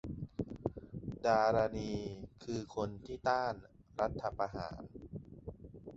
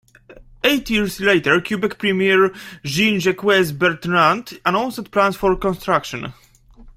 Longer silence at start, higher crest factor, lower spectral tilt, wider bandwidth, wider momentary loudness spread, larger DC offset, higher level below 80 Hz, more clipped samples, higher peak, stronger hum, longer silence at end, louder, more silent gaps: second, 0.05 s vs 0.3 s; about the same, 22 dB vs 18 dB; about the same, -5.5 dB/octave vs -4.5 dB/octave; second, 8 kHz vs 16 kHz; first, 18 LU vs 6 LU; neither; second, -56 dBFS vs -44 dBFS; neither; second, -16 dBFS vs -2 dBFS; neither; about the same, 0 s vs 0.05 s; second, -37 LUFS vs -18 LUFS; neither